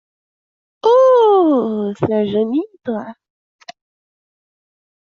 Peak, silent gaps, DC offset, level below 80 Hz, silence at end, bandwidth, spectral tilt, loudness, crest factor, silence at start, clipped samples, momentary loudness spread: -4 dBFS; none; under 0.1%; -60 dBFS; 1.9 s; 6.8 kHz; -7.5 dB/octave; -15 LUFS; 14 dB; 0.85 s; under 0.1%; 15 LU